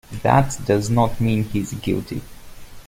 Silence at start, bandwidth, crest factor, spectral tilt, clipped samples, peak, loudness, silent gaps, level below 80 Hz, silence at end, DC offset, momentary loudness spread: 0.1 s; 16.5 kHz; 20 dB; -6.5 dB/octave; under 0.1%; -2 dBFS; -20 LUFS; none; -40 dBFS; 0.05 s; under 0.1%; 8 LU